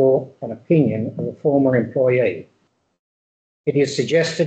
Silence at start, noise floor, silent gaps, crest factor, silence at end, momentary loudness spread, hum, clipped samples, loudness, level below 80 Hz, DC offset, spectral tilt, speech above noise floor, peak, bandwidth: 0 s; under -90 dBFS; 2.99-3.64 s; 16 dB; 0 s; 10 LU; none; under 0.1%; -19 LUFS; -62 dBFS; under 0.1%; -6.5 dB/octave; over 72 dB; -4 dBFS; 8.8 kHz